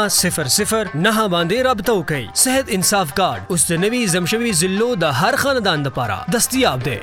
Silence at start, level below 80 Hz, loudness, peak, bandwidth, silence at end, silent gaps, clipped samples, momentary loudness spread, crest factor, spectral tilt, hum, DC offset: 0 s; -44 dBFS; -17 LUFS; 0 dBFS; 17.5 kHz; 0 s; none; under 0.1%; 4 LU; 16 dB; -3 dB/octave; none; under 0.1%